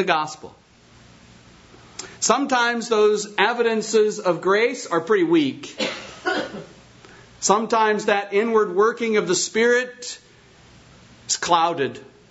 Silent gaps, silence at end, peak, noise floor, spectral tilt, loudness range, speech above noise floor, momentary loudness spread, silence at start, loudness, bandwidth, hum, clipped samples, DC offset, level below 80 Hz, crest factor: none; 0.25 s; -2 dBFS; -51 dBFS; -3 dB/octave; 3 LU; 30 dB; 15 LU; 0 s; -20 LUFS; 8 kHz; none; under 0.1%; under 0.1%; -62 dBFS; 20 dB